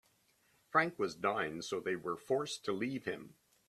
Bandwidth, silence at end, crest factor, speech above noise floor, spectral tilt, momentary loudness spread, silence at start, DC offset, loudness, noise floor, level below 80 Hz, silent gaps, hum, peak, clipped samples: 14 kHz; 0.35 s; 22 dB; 36 dB; -4.5 dB/octave; 7 LU; 0.75 s; under 0.1%; -37 LUFS; -73 dBFS; -76 dBFS; none; none; -16 dBFS; under 0.1%